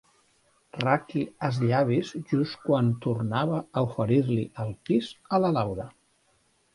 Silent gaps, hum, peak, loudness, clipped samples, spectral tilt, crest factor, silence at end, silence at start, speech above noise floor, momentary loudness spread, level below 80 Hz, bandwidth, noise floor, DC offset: none; none; -6 dBFS; -27 LUFS; under 0.1%; -8 dB/octave; 20 dB; 0.85 s; 0.75 s; 41 dB; 8 LU; -60 dBFS; 11.5 kHz; -67 dBFS; under 0.1%